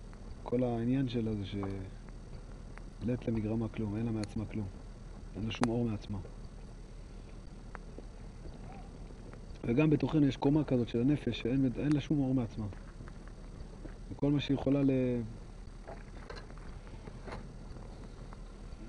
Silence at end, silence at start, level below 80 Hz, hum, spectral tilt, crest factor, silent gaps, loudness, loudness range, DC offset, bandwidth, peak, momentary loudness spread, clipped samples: 0 s; 0 s; -48 dBFS; none; -8 dB/octave; 22 dB; none; -33 LUFS; 14 LU; under 0.1%; 11 kHz; -14 dBFS; 21 LU; under 0.1%